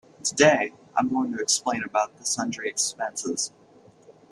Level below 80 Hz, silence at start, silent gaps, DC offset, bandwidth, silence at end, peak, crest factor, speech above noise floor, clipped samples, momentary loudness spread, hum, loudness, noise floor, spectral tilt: -68 dBFS; 0.25 s; none; under 0.1%; 13.5 kHz; 0.2 s; -4 dBFS; 22 dB; 29 dB; under 0.1%; 10 LU; none; -25 LUFS; -54 dBFS; -2.5 dB/octave